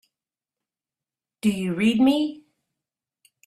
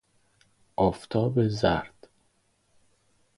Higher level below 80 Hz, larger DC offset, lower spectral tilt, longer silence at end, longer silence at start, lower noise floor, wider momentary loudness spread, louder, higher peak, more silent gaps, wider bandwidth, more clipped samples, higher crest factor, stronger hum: second, -62 dBFS vs -50 dBFS; neither; second, -6 dB/octave vs -7.5 dB/octave; second, 1.1 s vs 1.5 s; first, 1.45 s vs 0.8 s; first, under -90 dBFS vs -69 dBFS; second, 7 LU vs 12 LU; first, -22 LUFS vs -27 LUFS; about the same, -8 dBFS vs -8 dBFS; neither; first, 14 kHz vs 11.5 kHz; neither; about the same, 18 dB vs 22 dB; neither